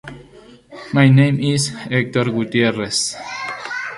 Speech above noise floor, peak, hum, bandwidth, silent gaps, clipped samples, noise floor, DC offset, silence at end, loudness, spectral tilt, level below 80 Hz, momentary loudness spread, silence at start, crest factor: 28 dB; -2 dBFS; none; 11.5 kHz; none; under 0.1%; -44 dBFS; under 0.1%; 0 s; -17 LUFS; -5 dB/octave; -54 dBFS; 14 LU; 0.05 s; 16 dB